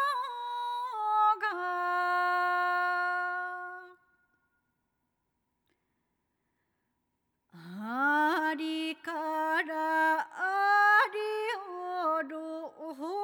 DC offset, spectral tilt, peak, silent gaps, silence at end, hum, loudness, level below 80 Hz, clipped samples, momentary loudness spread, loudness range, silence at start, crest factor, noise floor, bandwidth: under 0.1%; -3.5 dB/octave; -14 dBFS; none; 0 s; none; -29 LUFS; under -90 dBFS; under 0.1%; 13 LU; 9 LU; 0 s; 18 dB; -80 dBFS; over 20 kHz